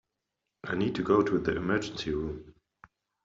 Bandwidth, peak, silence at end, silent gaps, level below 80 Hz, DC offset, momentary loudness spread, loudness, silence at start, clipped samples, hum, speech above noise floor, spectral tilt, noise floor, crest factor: 7.8 kHz; -12 dBFS; 0.75 s; none; -54 dBFS; under 0.1%; 13 LU; -30 LUFS; 0.65 s; under 0.1%; none; 56 dB; -5 dB/octave; -85 dBFS; 20 dB